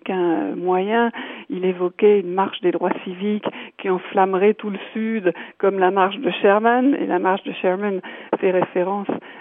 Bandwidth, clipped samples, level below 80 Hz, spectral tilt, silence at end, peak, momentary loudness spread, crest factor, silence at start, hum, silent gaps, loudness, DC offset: 3.8 kHz; under 0.1%; -80 dBFS; -10 dB/octave; 0 s; -4 dBFS; 9 LU; 16 dB; 0.05 s; none; none; -20 LUFS; under 0.1%